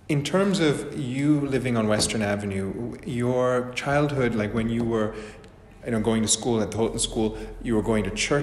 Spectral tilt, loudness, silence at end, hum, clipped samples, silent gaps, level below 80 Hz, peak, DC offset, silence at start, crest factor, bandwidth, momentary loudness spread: -5 dB/octave; -25 LUFS; 0 s; none; under 0.1%; none; -44 dBFS; -6 dBFS; under 0.1%; 0.1 s; 18 dB; 13 kHz; 8 LU